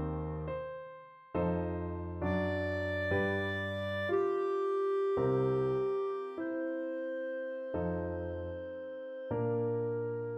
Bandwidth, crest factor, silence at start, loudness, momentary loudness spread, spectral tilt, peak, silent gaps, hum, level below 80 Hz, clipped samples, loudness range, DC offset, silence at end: 8 kHz; 14 dB; 0 s; -35 LUFS; 10 LU; -8.5 dB/octave; -20 dBFS; none; none; -54 dBFS; under 0.1%; 5 LU; under 0.1%; 0 s